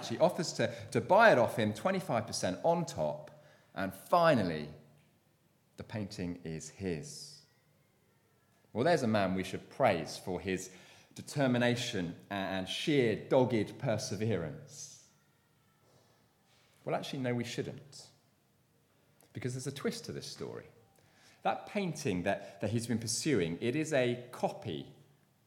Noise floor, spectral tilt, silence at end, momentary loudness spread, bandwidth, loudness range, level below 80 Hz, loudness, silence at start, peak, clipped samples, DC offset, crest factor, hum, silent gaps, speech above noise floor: -71 dBFS; -5 dB/octave; 0.55 s; 17 LU; 17.5 kHz; 12 LU; -70 dBFS; -33 LUFS; 0 s; -12 dBFS; under 0.1%; under 0.1%; 24 dB; none; none; 38 dB